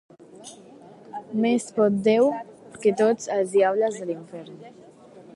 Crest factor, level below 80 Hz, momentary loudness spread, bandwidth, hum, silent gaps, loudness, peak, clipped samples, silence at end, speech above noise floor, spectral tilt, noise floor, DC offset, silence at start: 16 dB; -70 dBFS; 23 LU; 11.5 kHz; none; none; -23 LUFS; -8 dBFS; under 0.1%; 0.15 s; 25 dB; -5.5 dB/octave; -48 dBFS; under 0.1%; 0.4 s